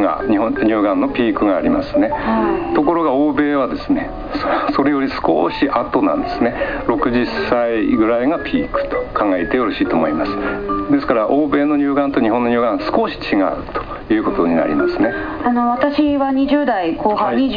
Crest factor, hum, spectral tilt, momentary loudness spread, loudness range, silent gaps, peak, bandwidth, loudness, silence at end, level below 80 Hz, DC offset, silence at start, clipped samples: 14 dB; none; -8 dB/octave; 4 LU; 1 LU; none; -2 dBFS; 5.2 kHz; -17 LUFS; 0 s; -38 dBFS; 0.3%; 0 s; under 0.1%